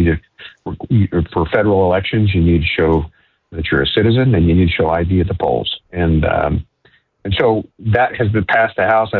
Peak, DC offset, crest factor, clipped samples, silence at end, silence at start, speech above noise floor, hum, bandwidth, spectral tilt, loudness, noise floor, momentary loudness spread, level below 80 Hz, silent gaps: -2 dBFS; under 0.1%; 12 dB; under 0.1%; 0 s; 0 s; 40 dB; none; 4.4 kHz; -10 dB/octave; -15 LUFS; -55 dBFS; 10 LU; -28 dBFS; none